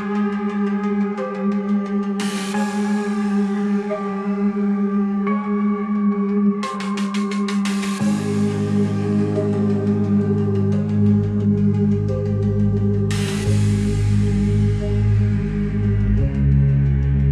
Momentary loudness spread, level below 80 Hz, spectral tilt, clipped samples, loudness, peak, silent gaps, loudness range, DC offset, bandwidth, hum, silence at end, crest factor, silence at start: 4 LU; -32 dBFS; -7.5 dB/octave; under 0.1%; -20 LUFS; -6 dBFS; none; 3 LU; under 0.1%; 11.5 kHz; none; 0 s; 12 dB; 0 s